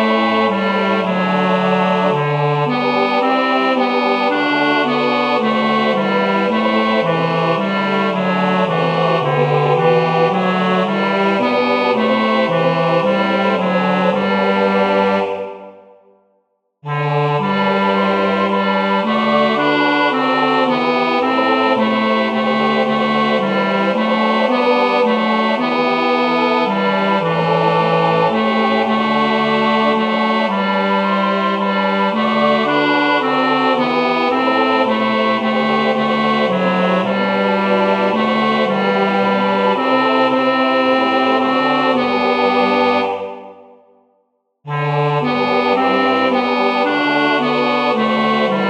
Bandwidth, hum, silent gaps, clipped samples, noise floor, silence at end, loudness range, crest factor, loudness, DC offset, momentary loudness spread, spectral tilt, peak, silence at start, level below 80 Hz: 9.4 kHz; none; none; under 0.1%; -64 dBFS; 0 s; 3 LU; 14 dB; -15 LUFS; under 0.1%; 2 LU; -7 dB/octave; -2 dBFS; 0 s; -64 dBFS